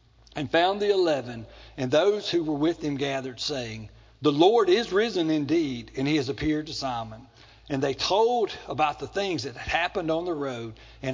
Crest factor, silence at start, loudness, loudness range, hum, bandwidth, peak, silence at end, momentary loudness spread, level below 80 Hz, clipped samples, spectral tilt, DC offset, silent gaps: 20 dB; 0.35 s; -26 LUFS; 3 LU; none; 7.6 kHz; -6 dBFS; 0 s; 13 LU; -52 dBFS; under 0.1%; -5 dB/octave; under 0.1%; none